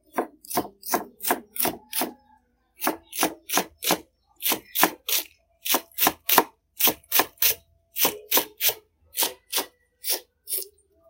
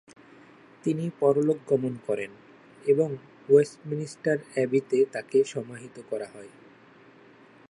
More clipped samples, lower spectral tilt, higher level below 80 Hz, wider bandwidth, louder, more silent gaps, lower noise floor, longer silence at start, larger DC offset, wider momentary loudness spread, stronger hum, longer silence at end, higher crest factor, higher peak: neither; second, -0.5 dB/octave vs -7 dB/octave; first, -64 dBFS vs -76 dBFS; first, 17 kHz vs 11 kHz; first, -24 LUFS vs -27 LUFS; neither; first, -62 dBFS vs -54 dBFS; second, 0.15 s vs 0.85 s; neither; second, 12 LU vs 16 LU; neither; second, 0.45 s vs 1.2 s; first, 28 dB vs 20 dB; first, 0 dBFS vs -8 dBFS